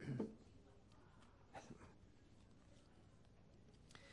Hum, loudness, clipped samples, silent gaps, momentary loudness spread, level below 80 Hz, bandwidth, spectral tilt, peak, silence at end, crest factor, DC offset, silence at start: none; -60 LUFS; under 0.1%; none; 18 LU; -74 dBFS; 10.5 kHz; -7 dB/octave; -32 dBFS; 0 s; 24 dB; under 0.1%; 0 s